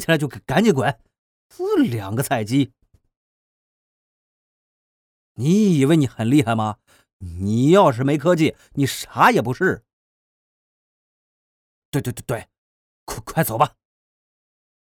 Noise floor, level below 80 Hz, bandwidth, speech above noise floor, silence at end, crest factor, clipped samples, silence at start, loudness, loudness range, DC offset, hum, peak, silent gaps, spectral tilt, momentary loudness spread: under -90 dBFS; -54 dBFS; 20 kHz; over 71 dB; 1.15 s; 20 dB; under 0.1%; 0 s; -20 LUFS; 10 LU; under 0.1%; none; -2 dBFS; 1.18-1.50 s, 3.16-5.35 s, 7.13-7.20 s, 9.93-11.92 s, 12.58-13.07 s; -6 dB/octave; 13 LU